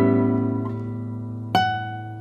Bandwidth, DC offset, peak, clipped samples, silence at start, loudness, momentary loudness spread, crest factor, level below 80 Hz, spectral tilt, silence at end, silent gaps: 13 kHz; under 0.1%; -6 dBFS; under 0.1%; 0 s; -24 LUFS; 11 LU; 18 dB; -56 dBFS; -7.5 dB/octave; 0 s; none